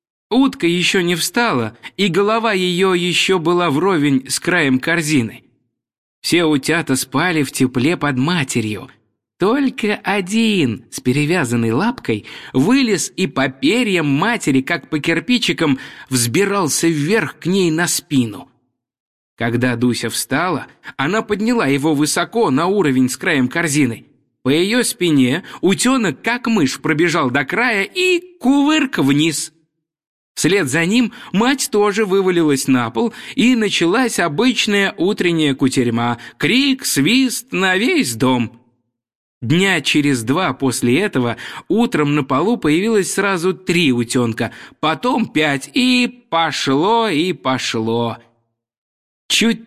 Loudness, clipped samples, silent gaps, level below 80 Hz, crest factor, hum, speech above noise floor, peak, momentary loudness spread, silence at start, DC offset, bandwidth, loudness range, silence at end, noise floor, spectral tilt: -16 LUFS; under 0.1%; 5.98-6.22 s, 19.00-19.37 s, 30.07-30.35 s, 39.15-39.41 s, 48.78-49.29 s; -54 dBFS; 14 dB; none; 50 dB; -2 dBFS; 6 LU; 0.3 s; 0.1%; 15.5 kHz; 2 LU; 0 s; -66 dBFS; -4.5 dB/octave